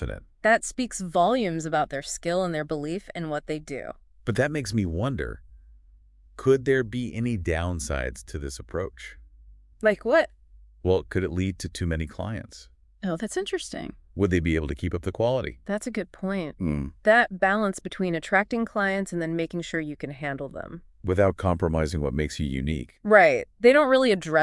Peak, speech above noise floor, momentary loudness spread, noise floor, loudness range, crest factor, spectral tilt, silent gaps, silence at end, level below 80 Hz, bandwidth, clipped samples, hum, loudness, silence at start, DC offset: -4 dBFS; 29 dB; 14 LU; -54 dBFS; 6 LU; 22 dB; -5.5 dB/octave; none; 0 s; -44 dBFS; 12 kHz; under 0.1%; none; -26 LUFS; 0 s; under 0.1%